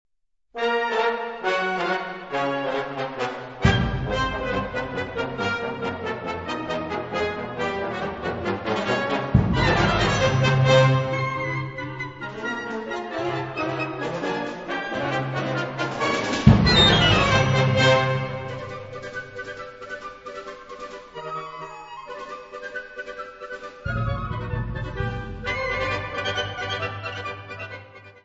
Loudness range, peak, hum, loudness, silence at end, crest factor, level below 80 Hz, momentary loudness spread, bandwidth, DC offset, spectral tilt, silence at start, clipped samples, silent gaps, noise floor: 16 LU; 0 dBFS; none; -24 LUFS; 0.05 s; 24 dB; -38 dBFS; 18 LU; 8 kHz; under 0.1%; -5.5 dB/octave; 0.55 s; under 0.1%; none; -55 dBFS